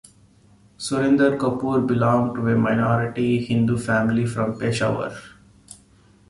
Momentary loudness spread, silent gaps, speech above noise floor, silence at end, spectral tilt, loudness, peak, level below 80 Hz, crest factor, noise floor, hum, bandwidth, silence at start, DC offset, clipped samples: 7 LU; none; 34 dB; 0.55 s; -7 dB/octave; -21 LUFS; -6 dBFS; -52 dBFS; 16 dB; -54 dBFS; none; 11.5 kHz; 0.8 s; under 0.1%; under 0.1%